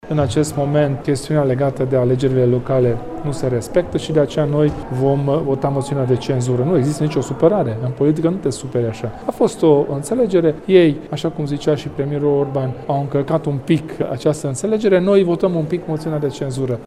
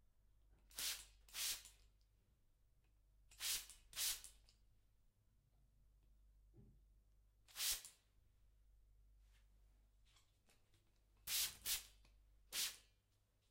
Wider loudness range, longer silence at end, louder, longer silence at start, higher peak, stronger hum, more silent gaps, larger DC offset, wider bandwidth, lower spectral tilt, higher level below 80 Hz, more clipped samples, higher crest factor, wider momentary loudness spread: second, 2 LU vs 5 LU; second, 0 s vs 0.7 s; first, -18 LUFS vs -45 LUFS; second, 0.05 s vs 0.7 s; first, 0 dBFS vs -28 dBFS; neither; neither; neither; second, 13.5 kHz vs 16 kHz; first, -7 dB/octave vs 2 dB/octave; first, -44 dBFS vs -72 dBFS; neither; second, 16 dB vs 26 dB; second, 7 LU vs 18 LU